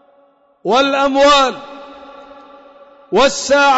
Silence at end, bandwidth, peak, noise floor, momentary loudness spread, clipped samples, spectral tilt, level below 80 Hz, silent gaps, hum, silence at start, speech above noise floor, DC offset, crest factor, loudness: 0 s; 8 kHz; -4 dBFS; -53 dBFS; 21 LU; under 0.1%; -2.5 dB/octave; -46 dBFS; none; none; 0.65 s; 41 dB; under 0.1%; 12 dB; -13 LUFS